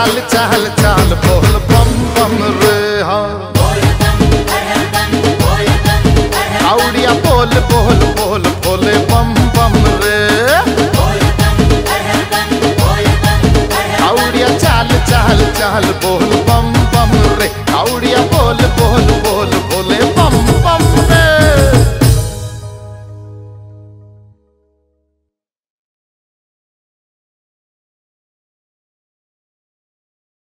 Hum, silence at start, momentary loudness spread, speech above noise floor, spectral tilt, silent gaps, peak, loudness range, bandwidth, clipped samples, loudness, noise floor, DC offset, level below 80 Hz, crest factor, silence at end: none; 0 s; 4 LU; 65 dB; -5 dB/octave; none; 0 dBFS; 2 LU; 16.5 kHz; under 0.1%; -11 LUFS; -75 dBFS; under 0.1%; -20 dBFS; 12 dB; 6.6 s